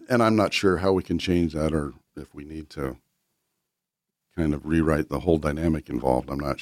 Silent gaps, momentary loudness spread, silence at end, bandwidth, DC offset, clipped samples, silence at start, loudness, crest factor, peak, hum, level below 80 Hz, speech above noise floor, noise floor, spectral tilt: none; 18 LU; 0 s; 15.5 kHz; under 0.1%; under 0.1%; 0 s; -24 LUFS; 20 dB; -6 dBFS; none; -40 dBFS; 61 dB; -85 dBFS; -6.5 dB/octave